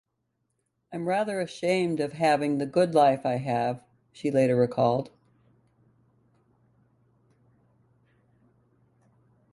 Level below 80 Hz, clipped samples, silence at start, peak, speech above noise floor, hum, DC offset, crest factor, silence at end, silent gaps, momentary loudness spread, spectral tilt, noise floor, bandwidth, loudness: -70 dBFS; under 0.1%; 0.9 s; -10 dBFS; 53 dB; none; under 0.1%; 20 dB; 4.45 s; none; 11 LU; -6.5 dB/octave; -78 dBFS; 11.5 kHz; -26 LUFS